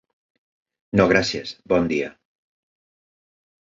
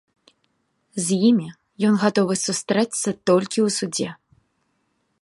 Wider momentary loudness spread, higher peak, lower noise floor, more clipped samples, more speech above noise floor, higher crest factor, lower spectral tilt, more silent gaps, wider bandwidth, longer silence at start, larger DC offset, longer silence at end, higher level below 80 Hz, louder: first, 12 LU vs 9 LU; about the same, -2 dBFS vs -4 dBFS; first, under -90 dBFS vs -70 dBFS; neither; first, over 70 dB vs 50 dB; about the same, 22 dB vs 20 dB; about the same, -5.5 dB/octave vs -4.5 dB/octave; neither; second, 7.8 kHz vs 11.5 kHz; about the same, 0.95 s vs 0.95 s; neither; first, 1.5 s vs 1.05 s; first, -50 dBFS vs -68 dBFS; about the same, -21 LUFS vs -21 LUFS